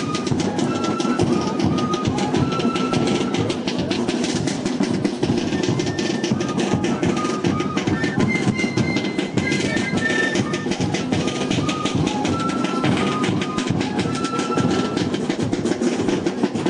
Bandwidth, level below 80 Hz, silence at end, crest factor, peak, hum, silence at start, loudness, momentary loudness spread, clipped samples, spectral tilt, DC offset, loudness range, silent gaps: 11 kHz; -48 dBFS; 0 s; 14 dB; -6 dBFS; none; 0 s; -21 LUFS; 3 LU; under 0.1%; -5 dB/octave; under 0.1%; 1 LU; none